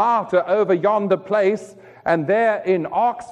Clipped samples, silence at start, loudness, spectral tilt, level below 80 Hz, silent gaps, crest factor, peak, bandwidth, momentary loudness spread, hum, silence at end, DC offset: under 0.1%; 0 s; -19 LUFS; -7 dB/octave; -64 dBFS; none; 14 dB; -6 dBFS; 10 kHz; 4 LU; none; 0 s; under 0.1%